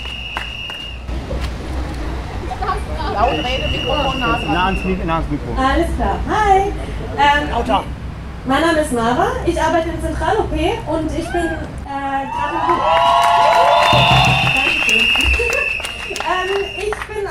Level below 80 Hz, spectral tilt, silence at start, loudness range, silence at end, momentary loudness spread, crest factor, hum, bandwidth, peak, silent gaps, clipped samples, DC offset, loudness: -28 dBFS; -4.5 dB/octave; 0 s; 8 LU; 0 s; 14 LU; 16 dB; none; 15.5 kHz; 0 dBFS; none; under 0.1%; under 0.1%; -16 LUFS